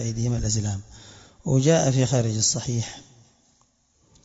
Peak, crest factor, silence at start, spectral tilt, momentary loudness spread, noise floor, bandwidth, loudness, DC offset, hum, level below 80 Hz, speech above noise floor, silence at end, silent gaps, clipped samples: -6 dBFS; 20 dB; 0 s; -5 dB/octave; 15 LU; -64 dBFS; 8 kHz; -23 LUFS; under 0.1%; none; -46 dBFS; 41 dB; 1.2 s; none; under 0.1%